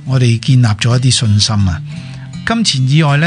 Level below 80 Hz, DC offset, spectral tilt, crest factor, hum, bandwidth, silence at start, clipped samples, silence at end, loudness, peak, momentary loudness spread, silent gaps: -40 dBFS; under 0.1%; -5 dB/octave; 12 dB; none; 10.5 kHz; 0 s; under 0.1%; 0 s; -12 LUFS; 0 dBFS; 13 LU; none